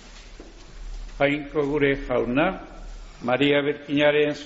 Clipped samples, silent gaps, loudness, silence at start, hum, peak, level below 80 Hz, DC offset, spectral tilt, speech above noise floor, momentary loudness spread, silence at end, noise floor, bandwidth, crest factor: under 0.1%; none; -23 LUFS; 0 s; none; -8 dBFS; -42 dBFS; under 0.1%; -3.5 dB/octave; 21 dB; 22 LU; 0 s; -43 dBFS; 8 kHz; 16 dB